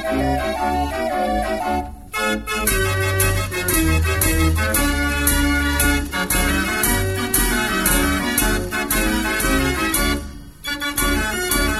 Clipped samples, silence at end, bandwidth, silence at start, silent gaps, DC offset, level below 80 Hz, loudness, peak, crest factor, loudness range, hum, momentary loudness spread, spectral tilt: under 0.1%; 0 s; 16.5 kHz; 0 s; none; 0.3%; -26 dBFS; -19 LUFS; -2 dBFS; 18 dB; 2 LU; none; 5 LU; -3.5 dB/octave